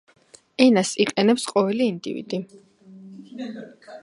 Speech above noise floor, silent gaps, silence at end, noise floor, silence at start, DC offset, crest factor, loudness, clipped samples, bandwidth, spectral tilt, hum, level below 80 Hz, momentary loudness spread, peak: 23 dB; none; 0.05 s; -45 dBFS; 0.6 s; under 0.1%; 22 dB; -21 LUFS; under 0.1%; 11.5 kHz; -4.5 dB/octave; none; -72 dBFS; 23 LU; 0 dBFS